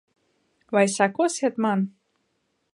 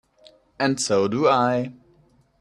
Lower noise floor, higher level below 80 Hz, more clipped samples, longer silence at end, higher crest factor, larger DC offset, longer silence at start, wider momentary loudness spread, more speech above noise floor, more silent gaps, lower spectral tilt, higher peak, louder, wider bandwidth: first, -73 dBFS vs -59 dBFS; second, -78 dBFS vs -62 dBFS; neither; first, 0.85 s vs 0.7 s; about the same, 20 dB vs 18 dB; neither; about the same, 0.7 s vs 0.6 s; about the same, 6 LU vs 8 LU; first, 51 dB vs 38 dB; neither; about the same, -5 dB/octave vs -4.5 dB/octave; about the same, -6 dBFS vs -6 dBFS; about the same, -23 LUFS vs -21 LUFS; about the same, 11.5 kHz vs 12.5 kHz